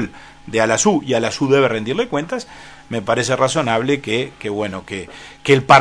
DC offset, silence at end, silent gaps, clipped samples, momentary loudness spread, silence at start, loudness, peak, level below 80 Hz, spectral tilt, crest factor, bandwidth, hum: under 0.1%; 0 s; none; under 0.1%; 13 LU; 0 s; -18 LUFS; 0 dBFS; -50 dBFS; -4 dB/octave; 18 dB; 11 kHz; none